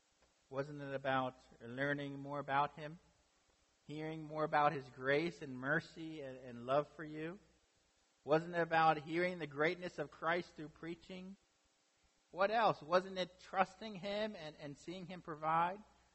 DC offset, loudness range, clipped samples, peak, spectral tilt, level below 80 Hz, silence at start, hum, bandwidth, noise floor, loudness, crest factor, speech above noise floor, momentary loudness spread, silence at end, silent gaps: under 0.1%; 4 LU; under 0.1%; -18 dBFS; -6 dB/octave; -76 dBFS; 0.5 s; none; 8.2 kHz; -77 dBFS; -39 LUFS; 22 dB; 38 dB; 16 LU; 0.3 s; none